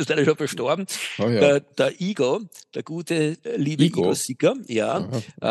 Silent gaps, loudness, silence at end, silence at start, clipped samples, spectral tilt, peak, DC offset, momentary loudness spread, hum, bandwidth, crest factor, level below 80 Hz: none; -23 LUFS; 0 s; 0 s; under 0.1%; -5 dB/octave; -4 dBFS; under 0.1%; 10 LU; none; 12.5 kHz; 20 dB; -68 dBFS